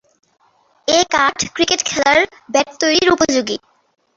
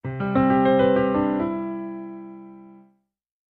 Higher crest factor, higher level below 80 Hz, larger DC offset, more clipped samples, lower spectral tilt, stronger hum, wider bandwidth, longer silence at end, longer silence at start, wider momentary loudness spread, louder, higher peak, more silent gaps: about the same, 18 dB vs 16 dB; about the same, -50 dBFS vs -52 dBFS; neither; neither; second, -1.5 dB/octave vs -10.5 dB/octave; neither; first, 8 kHz vs 4.3 kHz; second, 0.6 s vs 0.8 s; first, 0.85 s vs 0.05 s; second, 6 LU vs 21 LU; first, -15 LUFS vs -21 LUFS; first, 0 dBFS vs -6 dBFS; neither